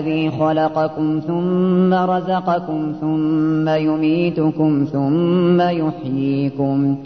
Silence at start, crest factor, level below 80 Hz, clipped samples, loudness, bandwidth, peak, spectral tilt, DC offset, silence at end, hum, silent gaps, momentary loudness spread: 0 s; 12 dB; -56 dBFS; under 0.1%; -18 LUFS; 6.2 kHz; -6 dBFS; -9.5 dB/octave; 0.2%; 0 s; none; none; 5 LU